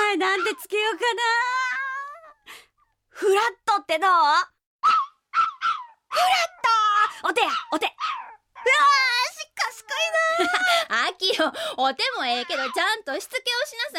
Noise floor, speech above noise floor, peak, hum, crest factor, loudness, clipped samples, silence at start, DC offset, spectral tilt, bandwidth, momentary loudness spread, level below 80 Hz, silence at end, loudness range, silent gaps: -65 dBFS; 43 dB; -8 dBFS; none; 16 dB; -22 LUFS; under 0.1%; 0 s; under 0.1%; 0 dB/octave; 17 kHz; 9 LU; -74 dBFS; 0 s; 3 LU; 4.66-4.79 s